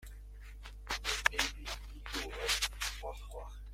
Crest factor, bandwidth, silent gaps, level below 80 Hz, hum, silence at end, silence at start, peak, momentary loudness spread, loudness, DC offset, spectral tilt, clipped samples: 30 dB; 16.5 kHz; none; -46 dBFS; none; 0 s; 0 s; -10 dBFS; 20 LU; -36 LUFS; under 0.1%; -1 dB/octave; under 0.1%